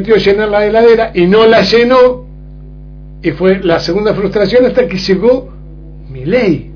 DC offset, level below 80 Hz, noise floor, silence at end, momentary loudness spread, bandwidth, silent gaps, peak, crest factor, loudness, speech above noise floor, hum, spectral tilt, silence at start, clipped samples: under 0.1%; -32 dBFS; -30 dBFS; 0 s; 9 LU; 5.4 kHz; none; 0 dBFS; 10 dB; -10 LUFS; 21 dB; 50 Hz at -30 dBFS; -6.5 dB/octave; 0 s; 0.4%